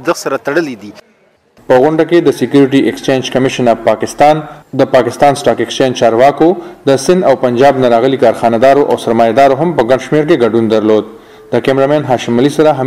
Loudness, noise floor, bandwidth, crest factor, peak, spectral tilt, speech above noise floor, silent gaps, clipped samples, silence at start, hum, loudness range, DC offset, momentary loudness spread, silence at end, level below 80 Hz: -10 LUFS; -49 dBFS; 15.5 kHz; 10 dB; 0 dBFS; -5.5 dB/octave; 40 dB; none; under 0.1%; 0 s; none; 2 LU; 0.3%; 7 LU; 0 s; -46 dBFS